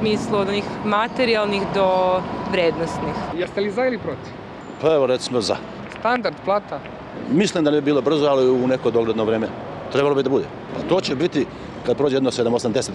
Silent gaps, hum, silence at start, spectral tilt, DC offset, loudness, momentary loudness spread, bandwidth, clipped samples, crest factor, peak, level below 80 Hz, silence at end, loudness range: none; none; 0 s; -5.5 dB/octave; under 0.1%; -21 LUFS; 11 LU; 11 kHz; under 0.1%; 14 dB; -6 dBFS; -50 dBFS; 0 s; 3 LU